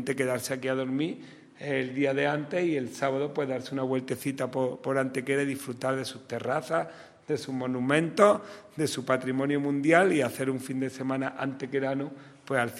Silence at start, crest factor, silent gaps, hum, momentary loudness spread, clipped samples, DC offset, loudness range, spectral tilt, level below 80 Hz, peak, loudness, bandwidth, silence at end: 0 s; 24 dB; none; none; 11 LU; under 0.1%; under 0.1%; 5 LU; -5.5 dB/octave; -74 dBFS; -6 dBFS; -29 LUFS; 16 kHz; 0 s